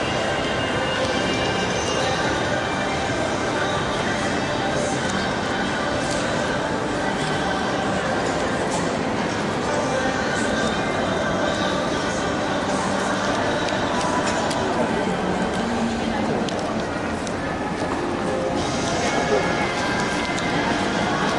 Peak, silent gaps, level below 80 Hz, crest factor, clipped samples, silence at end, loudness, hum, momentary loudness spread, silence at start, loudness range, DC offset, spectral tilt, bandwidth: -8 dBFS; none; -44 dBFS; 14 dB; under 0.1%; 0 s; -22 LUFS; none; 2 LU; 0 s; 1 LU; under 0.1%; -4.5 dB/octave; 11.5 kHz